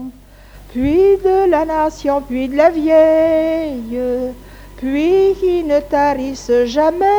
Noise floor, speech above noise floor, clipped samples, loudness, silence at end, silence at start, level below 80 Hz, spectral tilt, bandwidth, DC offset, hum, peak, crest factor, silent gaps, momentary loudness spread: -40 dBFS; 26 dB; under 0.1%; -15 LUFS; 0 s; 0 s; -38 dBFS; -6 dB/octave; over 20 kHz; under 0.1%; none; 0 dBFS; 14 dB; none; 10 LU